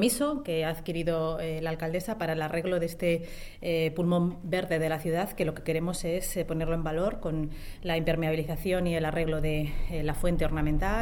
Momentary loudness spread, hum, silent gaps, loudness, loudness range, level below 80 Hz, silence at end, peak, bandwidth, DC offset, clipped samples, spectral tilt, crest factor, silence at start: 5 LU; none; none; -30 LUFS; 1 LU; -38 dBFS; 0 s; -12 dBFS; 18 kHz; under 0.1%; under 0.1%; -5.5 dB/octave; 16 dB; 0 s